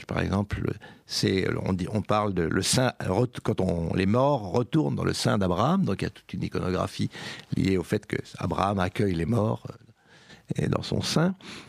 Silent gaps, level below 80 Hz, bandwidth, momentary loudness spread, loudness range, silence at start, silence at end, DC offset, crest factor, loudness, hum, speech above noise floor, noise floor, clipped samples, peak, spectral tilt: none; -50 dBFS; 15.5 kHz; 8 LU; 3 LU; 0 s; 0 s; under 0.1%; 20 dB; -27 LUFS; none; 27 dB; -53 dBFS; under 0.1%; -8 dBFS; -5.5 dB/octave